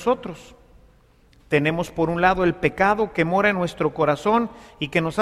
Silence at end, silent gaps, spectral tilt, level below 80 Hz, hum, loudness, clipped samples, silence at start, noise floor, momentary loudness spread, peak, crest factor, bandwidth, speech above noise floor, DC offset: 0 s; none; -6.5 dB/octave; -46 dBFS; none; -21 LUFS; under 0.1%; 0 s; -55 dBFS; 8 LU; -4 dBFS; 18 dB; 14 kHz; 34 dB; under 0.1%